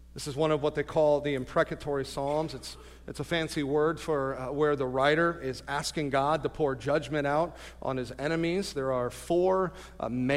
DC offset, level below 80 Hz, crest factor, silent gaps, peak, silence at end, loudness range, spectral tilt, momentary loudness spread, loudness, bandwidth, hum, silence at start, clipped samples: under 0.1%; -50 dBFS; 18 dB; none; -12 dBFS; 0 s; 2 LU; -5.5 dB/octave; 9 LU; -29 LUFS; 15.5 kHz; none; 0 s; under 0.1%